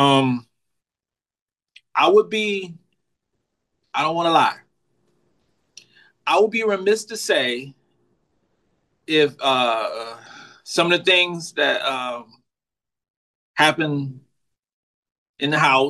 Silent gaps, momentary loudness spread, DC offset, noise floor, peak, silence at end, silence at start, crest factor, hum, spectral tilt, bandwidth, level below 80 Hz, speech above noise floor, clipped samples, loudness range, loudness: 1.42-1.46 s, 13.10-13.54 s, 14.73-15.03 s, 15.18-15.34 s; 15 LU; under 0.1%; under -90 dBFS; -2 dBFS; 0 s; 0 s; 22 dB; none; -4 dB/octave; 12.5 kHz; -74 dBFS; over 71 dB; under 0.1%; 5 LU; -20 LUFS